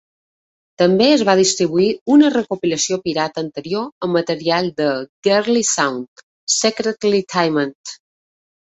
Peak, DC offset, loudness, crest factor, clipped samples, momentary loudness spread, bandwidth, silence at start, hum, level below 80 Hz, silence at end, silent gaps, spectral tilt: -2 dBFS; under 0.1%; -17 LUFS; 16 dB; under 0.1%; 11 LU; 8.2 kHz; 0.8 s; none; -60 dBFS; 0.8 s; 2.01-2.06 s, 3.92-4.01 s, 5.09-5.23 s, 6.08-6.16 s, 6.23-6.47 s, 7.75-7.84 s; -3.5 dB/octave